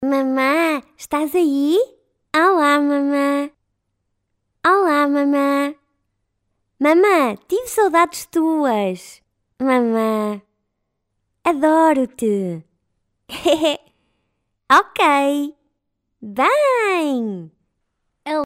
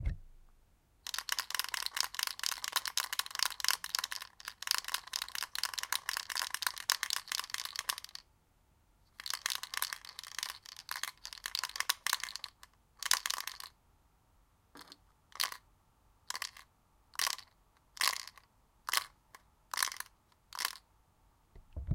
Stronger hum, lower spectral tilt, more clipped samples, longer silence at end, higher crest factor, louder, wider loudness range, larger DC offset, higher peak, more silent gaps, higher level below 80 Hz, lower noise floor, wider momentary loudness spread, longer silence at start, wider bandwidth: neither; first, -4.5 dB/octave vs 0.5 dB/octave; neither; about the same, 0 s vs 0 s; second, 16 dB vs 36 dB; first, -17 LUFS vs -36 LUFS; second, 3 LU vs 6 LU; neither; about the same, -2 dBFS vs -4 dBFS; neither; second, -62 dBFS vs -56 dBFS; first, -74 dBFS vs -70 dBFS; second, 12 LU vs 16 LU; about the same, 0 s vs 0 s; about the same, 16 kHz vs 17 kHz